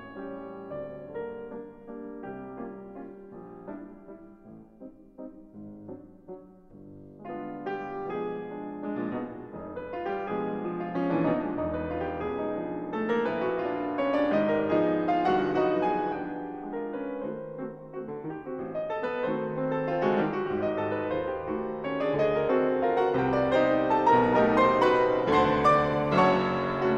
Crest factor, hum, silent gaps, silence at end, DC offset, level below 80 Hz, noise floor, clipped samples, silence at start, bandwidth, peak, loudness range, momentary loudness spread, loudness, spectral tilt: 18 dB; none; none; 0 s; under 0.1%; -56 dBFS; -50 dBFS; under 0.1%; 0 s; 8.4 kHz; -10 dBFS; 20 LU; 22 LU; -28 LUFS; -7.5 dB/octave